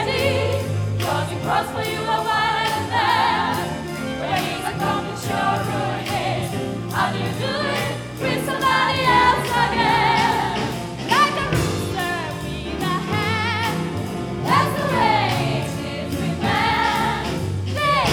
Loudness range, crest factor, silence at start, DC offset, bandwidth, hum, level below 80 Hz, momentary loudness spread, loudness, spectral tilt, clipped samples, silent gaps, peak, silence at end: 5 LU; 18 dB; 0 s; under 0.1%; 20 kHz; none; -42 dBFS; 9 LU; -21 LUFS; -5 dB/octave; under 0.1%; none; -4 dBFS; 0 s